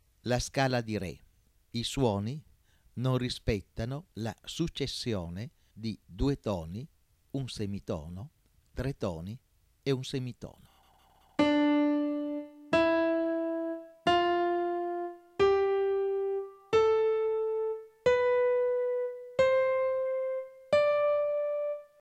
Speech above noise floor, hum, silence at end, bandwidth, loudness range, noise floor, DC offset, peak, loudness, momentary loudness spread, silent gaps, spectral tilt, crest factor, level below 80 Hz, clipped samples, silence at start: 30 dB; none; 0.15 s; 14.5 kHz; 9 LU; -63 dBFS; under 0.1%; -14 dBFS; -31 LUFS; 15 LU; none; -6 dB/octave; 18 dB; -52 dBFS; under 0.1%; 0.25 s